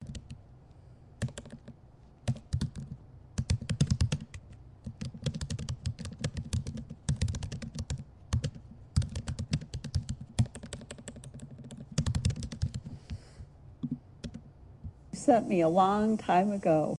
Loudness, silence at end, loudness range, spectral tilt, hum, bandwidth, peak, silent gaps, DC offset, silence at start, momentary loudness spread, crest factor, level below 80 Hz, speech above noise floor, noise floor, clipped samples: -33 LUFS; 0 s; 8 LU; -6.5 dB/octave; none; 11.5 kHz; -12 dBFS; none; under 0.1%; 0 s; 21 LU; 22 dB; -46 dBFS; 30 dB; -56 dBFS; under 0.1%